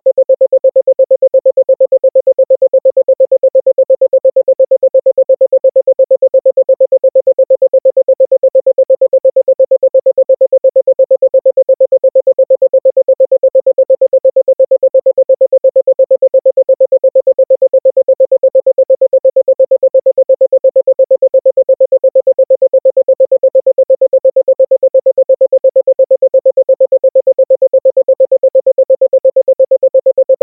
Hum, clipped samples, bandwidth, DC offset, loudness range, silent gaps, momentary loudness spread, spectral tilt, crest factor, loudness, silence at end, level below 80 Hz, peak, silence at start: none; under 0.1%; 1 kHz; under 0.1%; 0 LU; none; 1 LU; -11 dB/octave; 8 dB; -9 LUFS; 0.05 s; -66 dBFS; -2 dBFS; 0.05 s